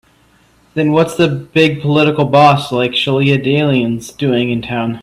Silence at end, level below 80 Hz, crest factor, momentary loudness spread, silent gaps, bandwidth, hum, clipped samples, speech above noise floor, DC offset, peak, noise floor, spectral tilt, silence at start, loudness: 0 s; -50 dBFS; 14 dB; 8 LU; none; 13.5 kHz; none; under 0.1%; 38 dB; under 0.1%; 0 dBFS; -51 dBFS; -6.5 dB/octave; 0.75 s; -13 LUFS